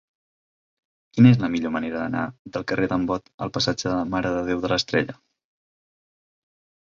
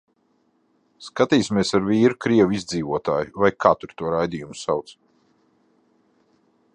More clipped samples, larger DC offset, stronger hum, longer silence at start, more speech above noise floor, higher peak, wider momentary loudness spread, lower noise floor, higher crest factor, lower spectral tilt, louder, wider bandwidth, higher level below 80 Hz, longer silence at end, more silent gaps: neither; neither; neither; first, 1.15 s vs 1 s; first, over 68 dB vs 45 dB; about the same, -4 dBFS vs -2 dBFS; first, 14 LU vs 9 LU; first, under -90 dBFS vs -65 dBFS; about the same, 22 dB vs 22 dB; about the same, -6 dB/octave vs -5.5 dB/octave; about the same, -23 LUFS vs -21 LUFS; second, 7.4 kHz vs 10.5 kHz; about the same, -52 dBFS vs -54 dBFS; second, 1.7 s vs 1.85 s; first, 2.39-2.45 s, 3.34-3.38 s vs none